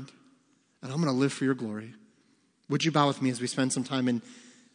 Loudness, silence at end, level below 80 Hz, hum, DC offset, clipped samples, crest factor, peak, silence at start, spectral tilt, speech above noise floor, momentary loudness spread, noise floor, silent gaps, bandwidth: -29 LUFS; 0.25 s; -80 dBFS; none; under 0.1%; under 0.1%; 22 dB; -8 dBFS; 0 s; -5 dB/octave; 39 dB; 15 LU; -67 dBFS; none; 10.5 kHz